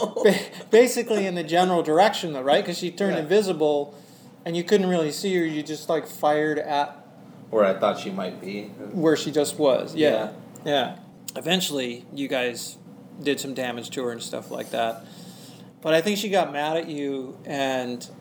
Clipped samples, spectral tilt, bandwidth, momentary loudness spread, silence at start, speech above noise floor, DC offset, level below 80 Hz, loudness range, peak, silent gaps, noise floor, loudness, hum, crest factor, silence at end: under 0.1%; -4.5 dB/octave; over 20 kHz; 13 LU; 0 s; 22 dB; under 0.1%; -78 dBFS; 6 LU; -6 dBFS; none; -46 dBFS; -24 LUFS; none; 18 dB; 0 s